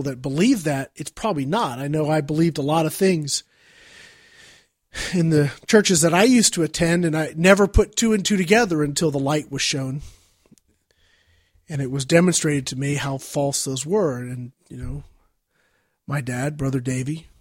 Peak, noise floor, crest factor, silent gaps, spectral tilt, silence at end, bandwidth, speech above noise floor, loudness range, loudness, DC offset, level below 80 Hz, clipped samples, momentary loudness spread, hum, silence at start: -2 dBFS; -67 dBFS; 20 dB; none; -4.5 dB/octave; 0.2 s; 16.5 kHz; 46 dB; 9 LU; -20 LUFS; under 0.1%; -40 dBFS; under 0.1%; 14 LU; none; 0 s